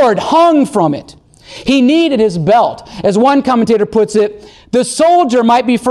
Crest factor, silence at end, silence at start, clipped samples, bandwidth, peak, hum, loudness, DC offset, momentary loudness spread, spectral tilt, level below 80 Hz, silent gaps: 10 dB; 0 s; 0 s; under 0.1%; 12.5 kHz; -2 dBFS; none; -11 LUFS; under 0.1%; 8 LU; -5.5 dB/octave; -46 dBFS; none